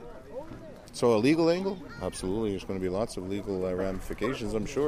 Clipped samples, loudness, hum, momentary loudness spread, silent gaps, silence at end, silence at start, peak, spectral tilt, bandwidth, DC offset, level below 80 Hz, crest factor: under 0.1%; -30 LUFS; none; 18 LU; none; 0 s; 0 s; -12 dBFS; -6 dB/octave; 15.5 kHz; under 0.1%; -46 dBFS; 18 dB